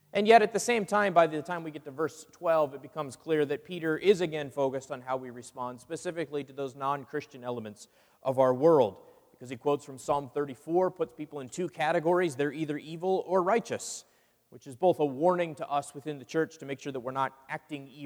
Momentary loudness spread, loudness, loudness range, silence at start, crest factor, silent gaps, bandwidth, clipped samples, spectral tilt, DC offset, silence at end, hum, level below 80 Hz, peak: 15 LU; -30 LUFS; 4 LU; 0.15 s; 22 dB; none; over 20 kHz; under 0.1%; -5 dB/octave; under 0.1%; 0 s; none; -74 dBFS; -8 dBFS